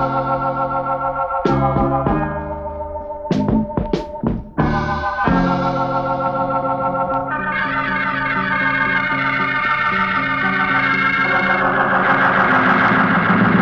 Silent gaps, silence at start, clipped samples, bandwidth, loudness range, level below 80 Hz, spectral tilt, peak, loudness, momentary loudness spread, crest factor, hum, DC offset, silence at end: none; 0 s; under 0.1%; 7 kHz; 5 LU; -36 dBFS; -7.5 dB/octave; -2 dBFS; -17 LUFS; 8 LU; 14 dB; none; under 0.1%; 0 s